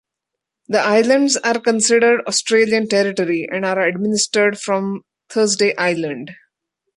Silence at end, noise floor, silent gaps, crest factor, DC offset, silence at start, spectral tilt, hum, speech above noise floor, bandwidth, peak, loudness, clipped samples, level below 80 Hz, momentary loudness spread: 0.6 s; -82 dBFS; none; 14 dB; under 0.1%; 0.7 s; -3 dB/octave; none; 66 dB; 11.5 kHz; -2 dBFS; -17 LUFS; under 0.1%; -66 dBFS; 10 LU